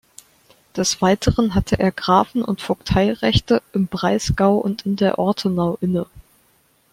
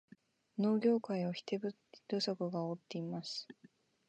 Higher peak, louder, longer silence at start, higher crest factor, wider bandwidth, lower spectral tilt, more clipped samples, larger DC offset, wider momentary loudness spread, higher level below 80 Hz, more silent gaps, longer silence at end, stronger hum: first, -2 dBFS vs -20 dBFS; first, -19 LUFS vs -38 LUFS; first, 0.75 s vs 0.55 s; about the same, 18 dB vs 18 dB; first, 15.5 kHz vs 8.8 kHz; about the same, -5.5 dB/octave vs -6.5 dB/octave; neither; neither; second, 6 LU vs 12 LU; first, -38 dBFS vs -86 dBFS; neither; first, 0.7 s vs 0.55 s; neither